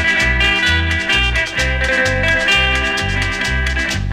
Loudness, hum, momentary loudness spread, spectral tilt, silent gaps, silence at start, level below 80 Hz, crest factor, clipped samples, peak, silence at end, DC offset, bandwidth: -14 LUFS; none; 5 LU; -3.5 dB/octave; none; 0 s; -24 dBFS; 14 dB; under 0.1%; -2 dBFS; 0 s; under 0.1%; 15 kHz